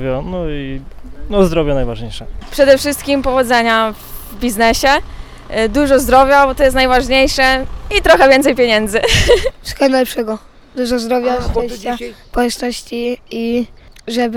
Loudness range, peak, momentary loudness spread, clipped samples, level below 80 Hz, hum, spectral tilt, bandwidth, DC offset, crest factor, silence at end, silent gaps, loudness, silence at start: 8 LU; 0 dBFS; 14 LU; under 0.1%; -28 dBFS; none; -4 dB/octave; 19.5 kHz; under 0.1%; 14 dB; 0 s; none; -13 LUFS; 0 s